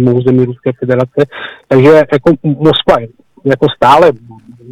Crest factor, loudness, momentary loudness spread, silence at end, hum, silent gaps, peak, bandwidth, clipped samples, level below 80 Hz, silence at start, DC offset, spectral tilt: 10 dB; -10 LUFS; 11 LU; 0 s; none; none; 0 dBFS; 13 kHz; 0.1%; -40 dBFS; 0 s; under 0.1%; -7.5 dB/octave